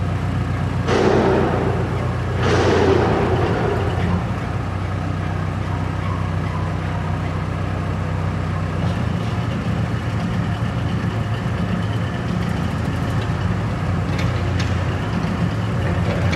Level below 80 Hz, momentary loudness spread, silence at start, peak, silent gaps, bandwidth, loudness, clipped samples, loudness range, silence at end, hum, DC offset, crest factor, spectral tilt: -32 dBFS; 7 LU; 0 s; -4 dBFS; none; 11.5 kHz; -21 LUFS; under 0.1%; 5 LU; 0 s; none; under 0.1%; 16 dB; -7 dB/octave